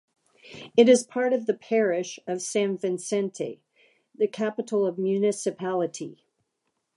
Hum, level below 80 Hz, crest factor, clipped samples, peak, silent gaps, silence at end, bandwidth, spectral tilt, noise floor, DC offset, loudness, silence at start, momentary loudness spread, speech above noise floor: none; -80 dBFS; 20 dB; under 0.1%; -6 dBFS; none; 0.85 s; 11.5 kHz; -4.5 dB/octave; -78 dBFS; under 0.1%; -25 LUFS; 0.45 s; 14 LU; 53 dB